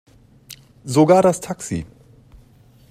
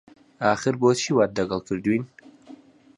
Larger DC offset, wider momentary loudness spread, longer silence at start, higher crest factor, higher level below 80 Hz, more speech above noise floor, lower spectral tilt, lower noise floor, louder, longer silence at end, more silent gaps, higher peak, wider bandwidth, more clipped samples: neither; first, 21 LU vs 6 LU; about the same, 0.5 s vs 0.4 s; about the same, 20 dB vs 18 dB; first, -52 dBFS vs -58 dBFS; first, 34 dB vs 26 dB; about the same, -6 dB/octave vs -5 dB/octave; about the same, -50 dBFS vs -48 dBFS; first, -18 LUFS vs -23 LUFS; first, 1.05 s vs 0.45 s; neither; first, -2 dBFS vs -6 dBFS; first, 15.5 kHz vs 11 kHz; neither